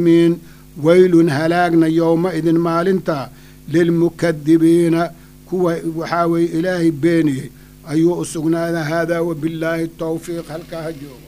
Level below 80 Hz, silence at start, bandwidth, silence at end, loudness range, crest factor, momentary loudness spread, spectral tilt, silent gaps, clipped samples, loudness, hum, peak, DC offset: -48 dBFS; 0 s; 15.5 kHz; 0.05 s; 5 LU; 16 dB; 13 LU; -7 dB/octave; none; under 0.1%; -17 LUFS; none; 0 dBFS; under 0.1%